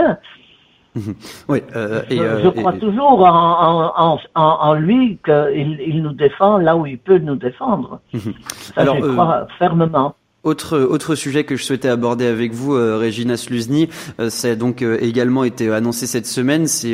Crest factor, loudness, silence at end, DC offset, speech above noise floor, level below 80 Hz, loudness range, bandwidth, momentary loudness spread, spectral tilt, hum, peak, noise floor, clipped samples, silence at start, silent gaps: 16 dB; -16 LUFS; 0 s; under 0.1%; 36 dB; -52 dBFS; 5 LU; 16 kHz; 10 LU; -5.5 dB/octave; none; 0 dBFS; -51 dBFS; under 0.1%; 0 s; none